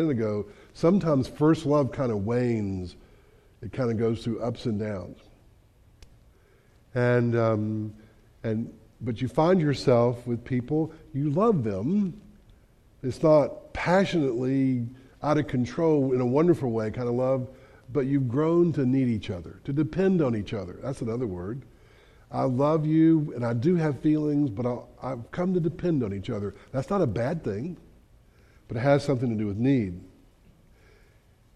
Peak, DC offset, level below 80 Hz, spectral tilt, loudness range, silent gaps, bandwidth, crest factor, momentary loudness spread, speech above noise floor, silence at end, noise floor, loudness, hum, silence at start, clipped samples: -8 dBFS; under 0.1%; -54 dBFS; -8.5 dB/octave; 5 LU; none; 11 kHz; 18 dB; 13 LU; 33 dB; 1.5 s; -59 dBFS; -26 LUFS; none; 0 s; under 0.1%